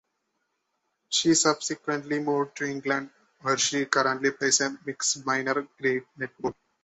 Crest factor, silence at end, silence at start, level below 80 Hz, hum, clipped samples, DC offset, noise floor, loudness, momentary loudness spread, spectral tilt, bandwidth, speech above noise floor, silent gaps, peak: 24 dB; 0.3 s; 1.1 s; -70 dBFS; none; under 0.1%; under 0.1%; -78 dBFS; -26 LUFS; 11 LU; -2 dB/octave; 8.4 kHz; 51 dB; none; -4 dBFS